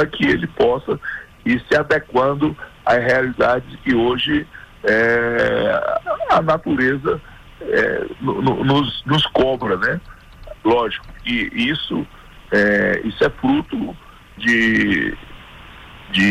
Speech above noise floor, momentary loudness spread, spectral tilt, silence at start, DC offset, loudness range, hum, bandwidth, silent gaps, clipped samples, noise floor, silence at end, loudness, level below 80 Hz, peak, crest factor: 22 dB; 9 LU; -6 dB/octave; 0 s; under 0.1%; 2 LU; none; 15 kHz; none; under 0.1%; -39 dBFS; 0 s; -18 LUFS; -42 dBFS; -6 dBFS; 12 dB